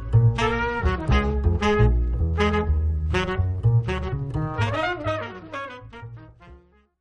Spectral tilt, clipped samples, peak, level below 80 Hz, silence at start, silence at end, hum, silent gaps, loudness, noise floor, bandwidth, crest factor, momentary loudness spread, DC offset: -7 dB/octave; under 0.1%; -6 dBFS; -28 dBFS; 0 s; 0.45 s; none; none; -23 LUFS; -51 dBFS; 8.6 kHz; 16 dB; 14 LU; under 0.1%